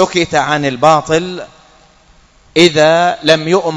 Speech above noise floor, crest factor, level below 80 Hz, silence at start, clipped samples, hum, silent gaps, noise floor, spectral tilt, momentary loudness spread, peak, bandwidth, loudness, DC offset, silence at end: 35 dB; 12 dB; -46 dBFS; 0 s; 0.6%; none; none; -47 dBFS; -4.5 dB/octave; 8 LU; 0 dBFS; 11 kHz; -11 LUFS; under 0.1%; 0 s